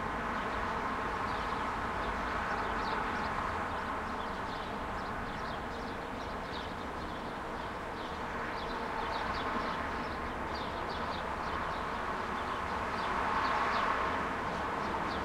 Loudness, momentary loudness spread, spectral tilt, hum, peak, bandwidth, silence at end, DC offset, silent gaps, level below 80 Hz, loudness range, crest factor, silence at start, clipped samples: -36 LUFS; 7 LU; -5 dB/octave; none; -18 dBFS; 16.5 kHz; 0 s; under 0.1%; none; -50 dBFS; 5 LU; 18 dB; 0 s; under 0.1%